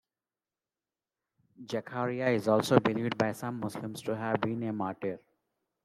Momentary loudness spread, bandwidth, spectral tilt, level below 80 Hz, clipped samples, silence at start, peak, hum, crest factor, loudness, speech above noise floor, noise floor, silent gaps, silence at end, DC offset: 12 LU; 16 kHz; -6 dB/octave; -72 dBFS; under 0.1%; 1.6 s; -8 dBFS; none; 24 dB; -31 LUFS; over 59 dB; under -90 dBFS; none; 0.7 s; under 0.1%